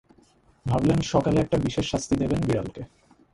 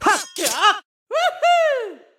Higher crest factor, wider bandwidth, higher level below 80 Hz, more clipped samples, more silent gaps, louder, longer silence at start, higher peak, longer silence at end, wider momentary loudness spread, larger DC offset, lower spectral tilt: about the same, 18 dB vs 16 dB; second, 11.5 kHz vs 17.5 kHz; first, -44 dBFS vs -62 dBFS; neither; second, none vs 0.85-1.06 s; second, -24 LUFS vs -19 LUFS; first, 0.65 s vs 0 s; second, -8 dBFS vs -2 dBFS; first, 0.5 s vs 0.2 s; first, 14 LU vs 10 LU; neither; first, -6.5 dB/octave vs 0 dB/octave